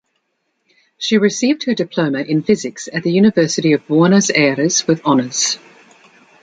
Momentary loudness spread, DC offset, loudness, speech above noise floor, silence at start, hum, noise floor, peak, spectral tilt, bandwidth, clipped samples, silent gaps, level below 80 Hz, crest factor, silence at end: 7 LU; under 0.1%; -15 LUFS; 54 dB; 1 s; none; -69 dBFS; -2 dBFS; -4.5 dB/octave; 9.4 kHz; under 0.1%; none; -60 dBFS; 14 dB; 0.85 s